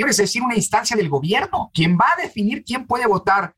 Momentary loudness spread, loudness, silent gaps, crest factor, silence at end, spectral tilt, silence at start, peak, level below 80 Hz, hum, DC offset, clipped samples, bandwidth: 7 LU; -19 LUFS; none; 14 dB; 0.1 s; -4 dB/octave; 0 s; -6 dBFS; -50 dBFS; none; under 0.1%; under 0.1%; 16 kHz